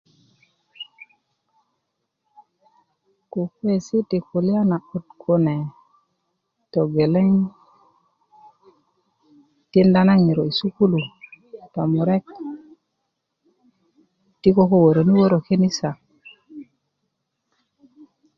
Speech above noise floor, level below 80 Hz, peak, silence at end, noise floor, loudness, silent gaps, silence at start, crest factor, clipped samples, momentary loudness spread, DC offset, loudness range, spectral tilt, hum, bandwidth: 59 dB; -58 dBFS; -4 dBFS; 1.75 s; -77 dBFS; -19 LUFS; none; 0.8 s; 20 dB; under 0.1%; 23 LU; under 0.1%; 8 LU; -8 dB/octave; none; 7 kHz